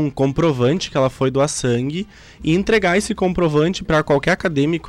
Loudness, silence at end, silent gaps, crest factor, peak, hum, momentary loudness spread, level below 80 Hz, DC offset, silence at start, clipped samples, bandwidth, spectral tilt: -18 LUFS; 0 s; none; 10 dB; -8 dBFS; none; 5 LU; -40 dBFS; under 0.1%; 0 s; under 0.1%; 13 kHz; -5.5 dB/octave